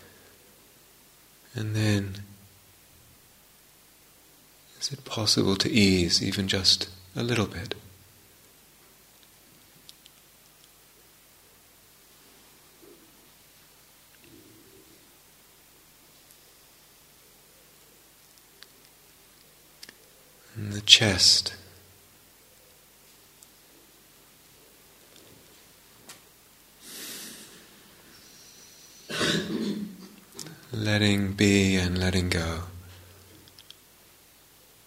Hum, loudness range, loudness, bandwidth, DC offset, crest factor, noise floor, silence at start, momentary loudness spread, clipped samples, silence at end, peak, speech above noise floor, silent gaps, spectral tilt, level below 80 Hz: 50 Hz at -60 dBFS; 21 LU; -24 LUFS; 16 kHz; under 0.1%; 32 dB; -57 dBFS; 1.55 s; 29 LU; under 0.1%; 1.85 s; 0 dBFS; 32 dB; none; -3.5 dB/octave; -56 dBFS